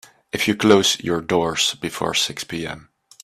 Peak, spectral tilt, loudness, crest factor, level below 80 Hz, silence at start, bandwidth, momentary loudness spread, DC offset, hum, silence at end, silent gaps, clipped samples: 0 dBFS; -3 dB/octave; -19 LUFS; 20 dB; -54 dBFS; 0.35 s; 15 kHz; 15 LU; under 0.1%; none; 0.4 s; none; under 0.1%